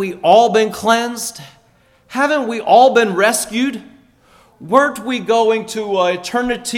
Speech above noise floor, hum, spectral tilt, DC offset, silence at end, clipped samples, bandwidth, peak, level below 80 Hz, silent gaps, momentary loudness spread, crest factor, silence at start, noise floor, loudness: 39 dB; none; -3.5 dB/octave; under 0.1%; 0 s; under 0.1%; 17.5 kHz; 0 dBFS; -54 dBFS; none; 11 LU; 16 dB; 0 s; -53 dBFS; -15 LUFS